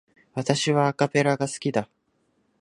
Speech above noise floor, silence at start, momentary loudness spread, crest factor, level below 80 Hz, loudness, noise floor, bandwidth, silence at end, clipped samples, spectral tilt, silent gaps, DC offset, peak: 46 dB; 0.35 s; 10 LU; 22 dB; -66 dBFS; -24 LUFS; -69 dBFS; 11.5 kHz; 0.75 s; under 0.1%; -5 dB/octave; none; under 0.1%; -4 dBFS